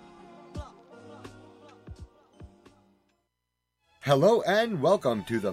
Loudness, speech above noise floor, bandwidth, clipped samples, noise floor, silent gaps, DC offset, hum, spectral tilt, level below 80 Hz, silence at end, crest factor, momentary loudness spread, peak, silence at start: -25 LUFS; 58 dB; 15.5 kHz; under 0.1%; -82 dBFS; none; under 0.1%; 60 Hz at -65 dBFS; -6 dB/octave; -56 dBFS; 0 s; 20 dB; 27 LU; -10 dBFS; 0.55 s